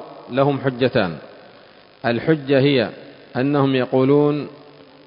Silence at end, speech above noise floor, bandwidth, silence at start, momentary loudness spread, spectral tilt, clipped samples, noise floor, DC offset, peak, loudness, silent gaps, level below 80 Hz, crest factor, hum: 0.5 s; 29 dB; 5.4 kHz; 0 s; 10 LU; -12 dB/octave; under 0.1%; -47 dBFS; under 0.1%; -2 dBFS; -19 LUFS; none; -56 dBFS; 18 dB; none